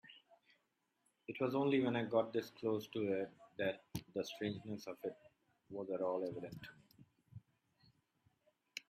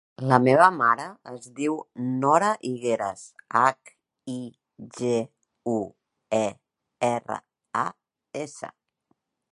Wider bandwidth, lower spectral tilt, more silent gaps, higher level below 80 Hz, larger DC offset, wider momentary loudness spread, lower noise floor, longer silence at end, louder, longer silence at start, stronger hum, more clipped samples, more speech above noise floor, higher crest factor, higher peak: first, 15.5 kHz vs 11.5 kHz; about the same, -6 dB/octave vs -6 dB/octave; neither; second, -78 dBFS vs -70 dBFS; neither; about the same, 20 LU vs 21 LU; first, -83 dBFS vs -73 dBFS; second, 0.1 s vs 0.85 s; second, -41 LUFS vs -25 LUFS; about the same, 0.1 s vs 0.2 s; neither; neither; second, 44 dB vs 48 dB; about the same, 20 dB vs 24 dB; second, -22 dBFS vs -2 dBFS